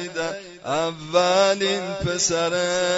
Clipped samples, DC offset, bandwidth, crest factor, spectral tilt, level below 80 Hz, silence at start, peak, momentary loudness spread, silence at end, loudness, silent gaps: under 0.1%; under 0.1%; 8 kHz; 18 dB; -3 dB/octave; -52 dBFS; 0 s; -6 dBFS; 10 LU; 0 s; -22 LUFS; none